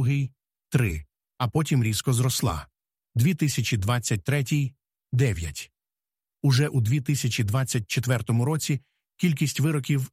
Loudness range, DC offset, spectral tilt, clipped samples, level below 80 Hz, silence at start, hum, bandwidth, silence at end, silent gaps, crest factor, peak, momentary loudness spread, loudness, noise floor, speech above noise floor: 1 LU; under 0.1%; -5.5 dB/octave; under 0.1%; -48 dBFS; 0 s; none; 15.5 kHz; 0.05 s; none; 16 dB; -10 dBFS; 8 LU; -25 LUFS; under -90 dBFS; over 66 dB